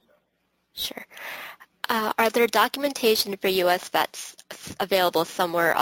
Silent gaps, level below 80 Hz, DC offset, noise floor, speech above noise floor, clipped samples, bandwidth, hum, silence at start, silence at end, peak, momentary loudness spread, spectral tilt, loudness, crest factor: none; -64 dBFS; under 0.1%; -72 dBFS; 49 dB; under 0.1%; 17 kHz; none; 0.75 s; 0 s; -4 dBFS; 17 LU; -2.5 dB/octave; -23 LUFS; 20 dB